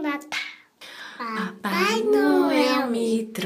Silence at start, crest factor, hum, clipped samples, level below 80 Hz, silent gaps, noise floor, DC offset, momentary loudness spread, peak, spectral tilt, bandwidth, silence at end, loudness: 0 s; 16 dB; none; under 0.1%; -70 dBFS; none; -44 dBFS; under 0.1%; 19 LU; -8 dBFS; -4.5 dB/octave; 15.5 kHz; 0 s; -23 LUFS